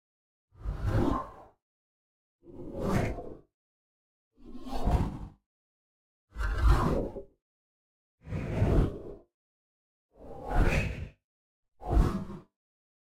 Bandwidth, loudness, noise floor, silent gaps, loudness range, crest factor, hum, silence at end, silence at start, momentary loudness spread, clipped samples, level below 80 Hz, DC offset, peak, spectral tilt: 13 kHz; -32 LUFS; under -90 dBFS; 1.62-2.39 s, 3.54-4.31 s, 5.46-6.28 s, 7.42-8.18 s, 9.34-10.09 s, 11.24-11.63 s; 7 LU; 22 dB; none; 0.65 s; 0.6 s; 21 LU; under 0.1%; -36 dBFS; under 0.1%; -10 dBFS; -7.5 dB/octave